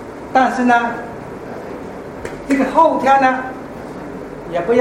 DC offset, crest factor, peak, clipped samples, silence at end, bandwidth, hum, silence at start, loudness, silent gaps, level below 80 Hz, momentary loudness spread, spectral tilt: under 0.1%; 16 dB; 0 dBFS; under 0.1%; 0 s; 13.5 kHz; none; 0 s; -15 LUFS; none; -46 dBFS; 17 LU; -5.5 dB/octave